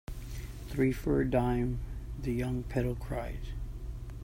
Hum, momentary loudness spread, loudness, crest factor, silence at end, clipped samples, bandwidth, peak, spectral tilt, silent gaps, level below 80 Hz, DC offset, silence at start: none; 14 LU; -34 LUFS; 18 dB; 0 s; under 0.1%; 16 kHz; -14 dBFS; -8 dB/octave; none; -40 dBFS; under 0.1%; 0.1 s